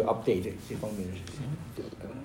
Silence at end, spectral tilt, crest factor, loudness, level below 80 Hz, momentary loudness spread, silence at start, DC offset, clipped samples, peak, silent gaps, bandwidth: 0 s; -7 dB/octave; 18 dB; -34 LUFS; -56 dBFS; 12 LU; 0 s; under 0.1%; under 0.1%; -14 dBFS; none; 16 kHz